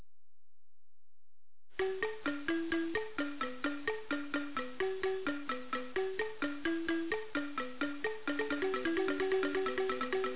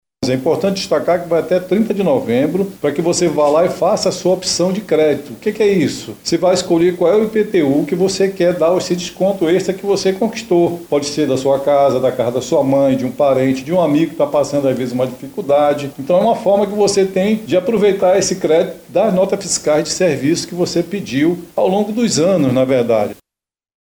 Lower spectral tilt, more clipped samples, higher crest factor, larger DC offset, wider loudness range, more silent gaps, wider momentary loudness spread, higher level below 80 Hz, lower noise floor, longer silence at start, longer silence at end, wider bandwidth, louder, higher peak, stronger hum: second, -2 dB/octave vs -5 dB/octave; neither; about the same, 16 dB vs 12 dB; first, 0.6% vs under 0.1%; about the same, 3 LU vs 1 LU; neither; about the same, 5 LU vs 5 LU; second, -66 dBFS vs -52 dBFS; about the same, under -90 dBFS vs -87 dBFS; second, 0 s vs 0.2 s; second, 0 s vs 0.7 s; second, 4 kHz vs over 20 kHz; second, -36 LUFS vs -15 LUFS; second, -22 dBFS vs -4 dBFS; neither